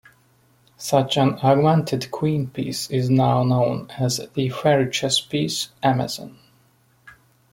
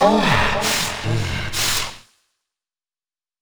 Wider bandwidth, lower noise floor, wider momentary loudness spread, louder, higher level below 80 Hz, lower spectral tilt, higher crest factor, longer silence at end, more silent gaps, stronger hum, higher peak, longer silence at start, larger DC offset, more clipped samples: second, 16.5 kHz vs over 20 kHz; second, -59 dBFS vs under -90 dBFS; about the same, 9 LU vs 7 LU; about the same, -21 LUFS vs -19 LUFS; second, -58 dBFS vs -36 dBFS; first, -5.5 dB/octave vs -3.5 dB/octave; about the same, 18 dB vs 20 dB; second, 0.4 s vs 1.4 s; neither; neither; about the same, -4 dBFS vs -2 dBFS; first, 0.8 s vs 0 s; neither; neither